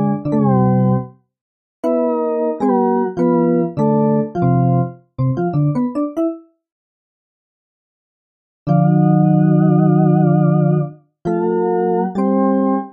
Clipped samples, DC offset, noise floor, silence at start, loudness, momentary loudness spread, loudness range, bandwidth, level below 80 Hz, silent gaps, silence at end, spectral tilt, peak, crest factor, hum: under 0.1%; under 0.1%; under -90 dBFS; 0 s; -16 LUFS; 9 LU; 8 LU; 3.1 kHz; -52 dBFS; 1.41-1.83 s, 6.72-8.66 s; 0 s; -12 dB/octave; -4 dBFS; 12 dB; none